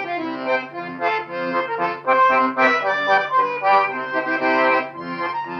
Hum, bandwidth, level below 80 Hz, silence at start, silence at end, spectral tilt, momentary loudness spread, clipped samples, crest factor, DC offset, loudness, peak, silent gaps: none; 7 kHz; -80 dBFS; 0 s; 0 s; -5 dB/octave; 9 LU; under 0.1%; 16 dB; under 0.1%; -19 LUFS; -4 dBFS; none